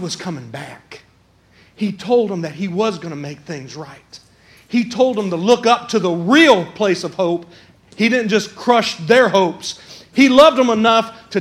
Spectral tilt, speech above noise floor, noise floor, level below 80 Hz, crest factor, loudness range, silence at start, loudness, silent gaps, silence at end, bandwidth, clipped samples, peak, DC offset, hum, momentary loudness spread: -4.5 dB/octave; 37 dB; -53 dBFS; -58 dBFS; 16 dB; 9 LU; 0 s; -15 LUFS; none; 0 s; 14.5 kHz; under 0.1%; 0 dBFS; under 0.1%; none; 19 LU